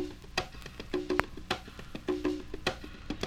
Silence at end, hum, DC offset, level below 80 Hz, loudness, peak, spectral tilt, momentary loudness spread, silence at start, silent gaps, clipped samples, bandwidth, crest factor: 0 s; none; under 0.1%; -48 dBFS; -36 LUFS; -4 dBFS; -4.5 dB/octave; 12 LU; 0 s; none; under 0.1%; 18.5 kHz; 32 dB